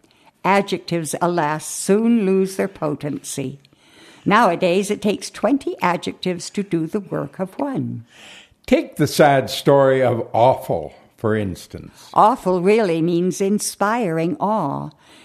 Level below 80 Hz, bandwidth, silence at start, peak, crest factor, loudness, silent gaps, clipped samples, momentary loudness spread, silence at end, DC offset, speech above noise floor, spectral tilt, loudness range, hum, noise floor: -54 dBFS; 14 kHz; 0.45 s; 0 dBFS; 18 dB; -19 LUFS; none; under 0.1%; 12 LU; 0.35 s; under 0.1%; 29 dB; -5.5 dB/octave; 5 LU; none; -48 dBFS